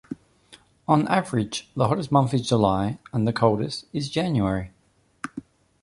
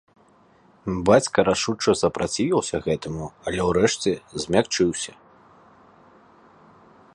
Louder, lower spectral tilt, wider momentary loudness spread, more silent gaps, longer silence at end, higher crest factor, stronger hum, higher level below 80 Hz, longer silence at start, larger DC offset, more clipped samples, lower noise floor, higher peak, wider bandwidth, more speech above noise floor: about the same, -24 LUFS vs -23 LUFS; first, -6.5 dB/octave vs -4.5 dB/octave; first, 16 LU vs 12 LU; neither; second, 0.4 s vs 2.05 s; about the same, 20 dB vs 22 dB; neither; about the same, -50 dBFS vs -48 dBFS; second, 0.1 s vs 0.85 s; neither; neither; first, -63 dBFS vs -56 dBFS; about the same, -4 dBFS vs -2 dBFS; about the same, 11.5 kHz vs 11.5 kHz; first, 40 dB vs 34 dB